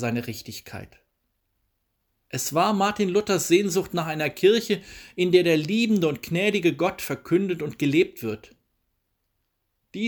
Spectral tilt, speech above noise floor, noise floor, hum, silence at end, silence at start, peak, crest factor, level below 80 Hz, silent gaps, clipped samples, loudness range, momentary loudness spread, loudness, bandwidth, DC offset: -5 dB/octave; 52 dB; -76 dBFS; none; 0 s; 0 s; -6 dBFS; 20 dB; -60 dBFS; none; under 0.1%; 5 LU; 16 LU; -23 LUFS; over 20 kHz; under 0.1%